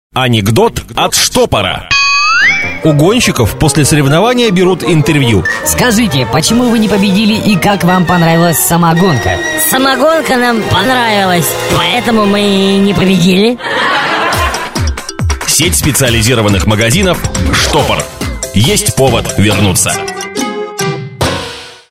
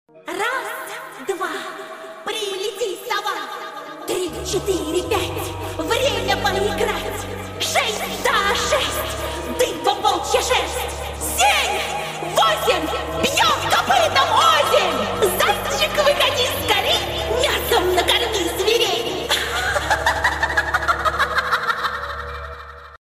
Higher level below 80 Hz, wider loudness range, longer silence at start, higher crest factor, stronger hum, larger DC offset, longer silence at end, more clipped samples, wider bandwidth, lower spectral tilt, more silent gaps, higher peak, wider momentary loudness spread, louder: first, -26 dBFS vs -38 dBFS; second, 2 LU vs 8 LU; about the same, 0.15 s vs 0.15 s; second, 10 dB vs 18 dB; neither; neither; about the same, 0.15 s vs 0.05 s; neither; about the same, 16.5 kHz vs 16 kHz; first, -4 dB/octave vs -2.5 dB/octave; neither; first, 0 dBFS vs -4 dBFS; second, 7 LU vs 12 LU; first, -9 LUFS vs -19 LUFS